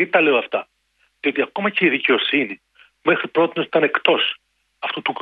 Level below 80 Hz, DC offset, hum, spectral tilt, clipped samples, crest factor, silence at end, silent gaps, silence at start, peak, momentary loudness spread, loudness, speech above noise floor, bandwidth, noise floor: -70 dBFS; under 0.1%; none; -7 dB/octave; under 0.1%; 20 dB; 0 s; none; 0 s; -2 dBFS; 11 LU; -19 LUFS; 46 dB; 5 kHz; -65 dBFS